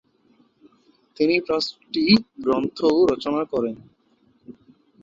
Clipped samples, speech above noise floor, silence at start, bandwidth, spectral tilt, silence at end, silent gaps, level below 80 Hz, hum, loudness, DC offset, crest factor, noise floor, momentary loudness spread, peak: under 0.1%; 41 dB; 1.2 s; 7.6 kHz; -6 dB/octave; 0.5 s; none; -58 dBFS; none; -21 LUFS; under 0.1%; 20 dB; -62 dBFS; 8 LU; -2 dBFS